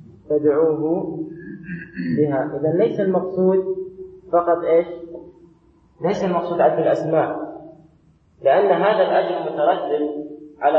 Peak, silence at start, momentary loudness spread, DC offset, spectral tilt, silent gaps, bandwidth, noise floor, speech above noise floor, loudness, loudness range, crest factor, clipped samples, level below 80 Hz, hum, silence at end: -4 dBFS; 0.3 s; 16 LU; under 0.1%; -8 dB/octave; none; 7 kHz; -55 dBFS; 37 dB; -20 LUFS; 3 LU; 16 dB; under 0.1%; -60 dBFS; none; 0 s